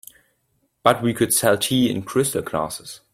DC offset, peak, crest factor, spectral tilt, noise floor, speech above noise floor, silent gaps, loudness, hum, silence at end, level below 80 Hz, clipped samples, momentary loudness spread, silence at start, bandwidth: under 0.1%; -2 dBFS; 20 dB; -4 dB/octave; -69 dBFS; 48 dB; none; -20 LUFS; none; 0.2 s; -56 dBFS; under 0.1%; 9 LU; 0.85 s; 16.5 kHz